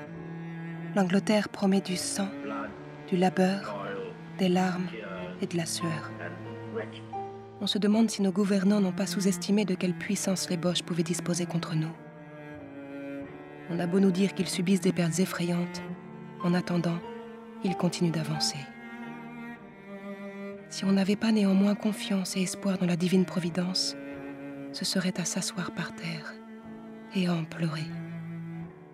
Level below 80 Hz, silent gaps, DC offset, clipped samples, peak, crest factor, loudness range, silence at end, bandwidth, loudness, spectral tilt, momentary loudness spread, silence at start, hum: -70 dBFS; none; under 0.1%; under 0.1%; -12 dBFS; 18 dB; 6 LU; 0 s; 14.5 kHz; -29 LUFS; -5 dB/octave; 16 LU; 0 s; none